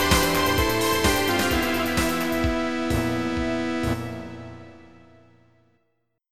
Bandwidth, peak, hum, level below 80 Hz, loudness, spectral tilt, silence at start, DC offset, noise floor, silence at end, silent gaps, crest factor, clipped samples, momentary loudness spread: 19 kHz; -6 dBFS; none; -36 dBFS; -23 LUFS; -4 dB/octave; 0 s; 0.7%; -74 dBFS; 0 s; none; 18 dB; under 0.1%; 15 LU